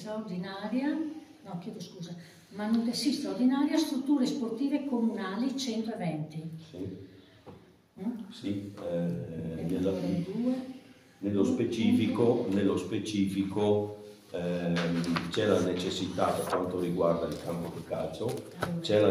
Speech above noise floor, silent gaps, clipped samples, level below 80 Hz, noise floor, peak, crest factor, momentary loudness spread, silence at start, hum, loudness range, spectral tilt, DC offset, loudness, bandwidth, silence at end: 23 dB; none; under 0.1%; -68 dBFS; -54 dBFS; -12 dBFS; 20 dB; 14 LU; 0 s; none; 7 LU; -6 dB/octave; under 0.1%; -31 LUFS; 15.5 kHz; 0 s